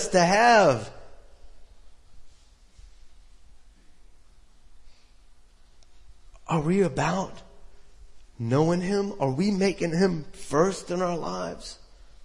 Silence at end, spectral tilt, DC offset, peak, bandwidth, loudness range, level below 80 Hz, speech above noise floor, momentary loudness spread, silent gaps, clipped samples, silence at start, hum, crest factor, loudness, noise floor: 0 s; -5.5 dB/octave; under 0.1%; -8 dBFS; 11.5 kHz; 6 LU; -52 dBFS; 29 dB; 17 LU; none; under 0.1%; 0 s; none; 20 dB; -24 LUFS; -53 dBFS